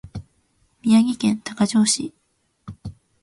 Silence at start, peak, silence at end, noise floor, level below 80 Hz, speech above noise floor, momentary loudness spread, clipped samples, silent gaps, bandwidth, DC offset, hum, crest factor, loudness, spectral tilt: 0.05 s; -6 dBFS; 0.3 s; -64 dBFS; -52 dBFS; 45 dB; 22 LU; under 0.1%; none; 11.5 kHz; under 0.1%; none; 16 dB; -20 LUFS; -4 dB/octave